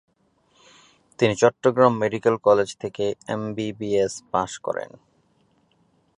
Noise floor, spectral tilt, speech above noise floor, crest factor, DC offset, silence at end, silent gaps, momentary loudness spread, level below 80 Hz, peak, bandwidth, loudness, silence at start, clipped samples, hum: -64 dBFS; -5.5 dB/octave; 42 dB; 22 dB; under 0.1%; 1.3 s; none; 11 LU; -60 dBFS; -2 dBFS; 10.5 kHz; -22 LUFS; 1.2 s; under 0.1%; none